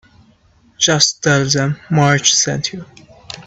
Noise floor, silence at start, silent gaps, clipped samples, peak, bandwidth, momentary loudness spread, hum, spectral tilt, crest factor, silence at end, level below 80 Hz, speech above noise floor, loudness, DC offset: -52 dBFS; 0.8 s; none; under 0.1%; 0 dBFS; 8.4 kHz; 12 LU; none; -3 dB/octave; 16 dB; 0.05 s; -50 dBFS; 37 dB; -14 LUFS; under 0.1%